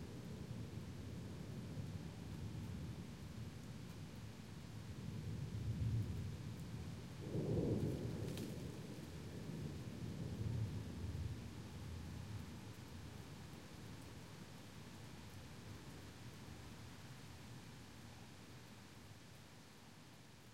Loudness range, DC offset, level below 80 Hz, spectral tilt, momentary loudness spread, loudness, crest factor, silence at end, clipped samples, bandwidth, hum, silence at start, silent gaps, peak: 11 LU; under 0.1%; -60 dBFS; -6.5 dB/octave; 14 LU; -49 LUFS; 20 dB; 0 s; under 0.1%; 16 kHz; none; 0 s; none; -28 dBFS